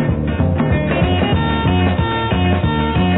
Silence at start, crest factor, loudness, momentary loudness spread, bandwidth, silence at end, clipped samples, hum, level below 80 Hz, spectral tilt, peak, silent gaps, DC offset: 0 s; 12 dB; -16 LUFS; 2 LU; 4.1 kHz; 0 s; under 0.1%; none; -26 dBFS; -10.5 dB/octave; -4 dBFS; none; under 0.1%